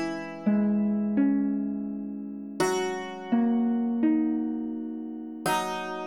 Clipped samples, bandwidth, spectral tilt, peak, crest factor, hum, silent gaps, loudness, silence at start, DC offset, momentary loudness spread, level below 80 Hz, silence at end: under 0.1%; 17.5 kHz; -6 dB/octave; -12 dBFS; 14 dB; none; none; -28 LUFS; 0 s; under 0.1%; 11 LU; -68 dBFS; 0 s